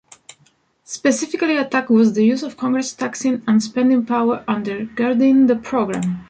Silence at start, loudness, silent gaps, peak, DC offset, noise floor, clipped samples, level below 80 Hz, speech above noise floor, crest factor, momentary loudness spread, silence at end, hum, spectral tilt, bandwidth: 0.9 s; -18 LUFS; none; -4 dBFS; under 0.1%; -59 dBFS; under 0.1%; -58 dBFS; 41 dB; 14 dB; 8 LU; 0.05 s; none; -5 dB/octave; 9.2 kHz